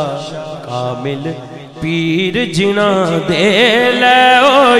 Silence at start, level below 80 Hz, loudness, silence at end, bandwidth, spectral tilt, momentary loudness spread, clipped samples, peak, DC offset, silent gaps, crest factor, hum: 0 s; -48 dBFS; -11 LUFS; 0 s; 14.5 kHz; -4.5 dB/octave; 17 LU; under 0.1%; 0 dBFS; under 0.1%; none; 12 dB; none